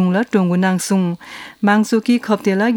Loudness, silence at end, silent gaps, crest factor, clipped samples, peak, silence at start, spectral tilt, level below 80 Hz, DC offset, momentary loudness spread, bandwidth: -16 LUFS; 0 s; none; 16 dB; under 0.1%; 0 dBFS; 0 s; -6 dB/octave; -64 dBFS; under 0.1%; 7 LU; 18 kHz